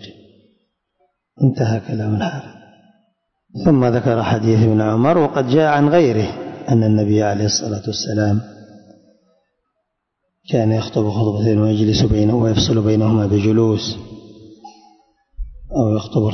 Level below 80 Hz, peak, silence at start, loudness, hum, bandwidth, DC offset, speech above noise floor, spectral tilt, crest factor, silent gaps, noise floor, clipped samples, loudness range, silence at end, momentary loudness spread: -40 dBFS; -2 dBFS; 0 s; -17 LUFS; none; 6.4 kHz; under 0.1%; 59 dB; -6.5 dB/octave; 16 dB; none; -74 dBFS; under 0.1%; 8 LU; 0 s; 10 LU